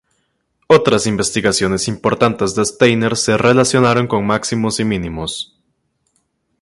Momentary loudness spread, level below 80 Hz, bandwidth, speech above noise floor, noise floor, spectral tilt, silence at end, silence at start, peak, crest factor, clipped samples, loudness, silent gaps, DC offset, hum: 9 LU; -44 dBFS; 11.5 kHz; 51 dB; -66 dBFS; -4.5 dB/octave; 1.15 s; 0.7 s; 0 dBFS; 16 dB; under 0.1%; -15 LUFS; none; under 0.1%; none